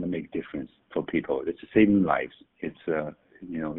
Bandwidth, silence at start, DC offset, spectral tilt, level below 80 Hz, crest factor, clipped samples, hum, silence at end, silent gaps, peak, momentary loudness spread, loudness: 3.9 kHz; 0 s; under 0.1%; -6 dB/octave; -58 dBFS; 20 dB; under 0.1%; none; 0 s; none; -8 dBFS; 17 LU; -27 LUFS